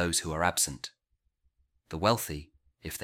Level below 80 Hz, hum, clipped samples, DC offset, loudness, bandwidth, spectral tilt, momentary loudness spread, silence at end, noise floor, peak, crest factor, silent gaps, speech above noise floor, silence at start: -52 dBFS; none; under 0.1%; under 0.1%; -29 LUFS; 17.5 kHz; -3 dB/octave; 16 LU; 0 s; -76 dBFS; -10 dBFS; 22 dB; none; 46 dB; 0 s